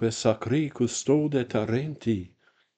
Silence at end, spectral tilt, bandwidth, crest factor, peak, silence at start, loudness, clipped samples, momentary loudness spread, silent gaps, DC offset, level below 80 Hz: 0.5 s; -5.5 dB/octave; 9.4 kHz; 20 dB; -8 dBFS; 0 s; -27 LUFS; under 0.1%; 6 LU; none; under 0.1%; -62 dBFS